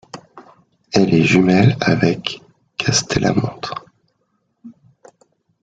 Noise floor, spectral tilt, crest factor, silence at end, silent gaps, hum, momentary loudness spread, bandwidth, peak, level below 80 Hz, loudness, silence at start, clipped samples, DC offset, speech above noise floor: -67 dBFS; -5 dB/octave; 18 dB; 0.9 s; none; none; 19 LU; 9.2 kHz; 0 dBFS; -48 dBFS; -16 LUFS; 0.15 s; under 0.1%; under 0.1%; 52 dB